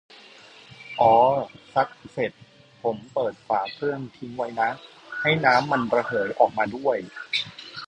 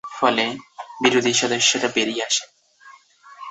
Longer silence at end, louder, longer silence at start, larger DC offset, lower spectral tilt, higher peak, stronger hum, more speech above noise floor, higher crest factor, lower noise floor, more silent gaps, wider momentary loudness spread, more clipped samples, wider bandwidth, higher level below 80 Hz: about the same, 0 s vs 0 s; second, -24 LUFS vs -19 LUFS; first, 0.8 s vs 0.05 s; neither; first, -5.5 dB/octave vs -1.5 dB/octave; about the same, -4 dBFS vs -2 dBFS; neither; second, 25 dB vs 29 dB; about the same, 20 dB vs 20 dB; about the same, -48 dBFS vs -49 dBFS; neither; about the same, 14 LU vs 15 LU; neither; first, 9.8 kHz vs 8.4 kHz; about the same, -64 dBFS vs -68 dBFS